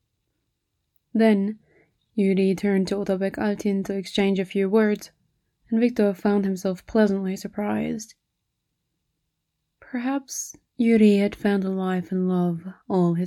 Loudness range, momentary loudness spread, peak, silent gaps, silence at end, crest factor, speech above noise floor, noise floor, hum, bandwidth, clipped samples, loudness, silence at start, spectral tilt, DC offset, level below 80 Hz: 5 LU; 10 LU; -6 dBFS; none; 0 s; 18 dB; 56 dB; -78 dBFS; none; 13.5 kHz; under 0.1%; -23 LUFS; 1.15 s; -6.5 dB/octave; under 0.1%; -60 dBFS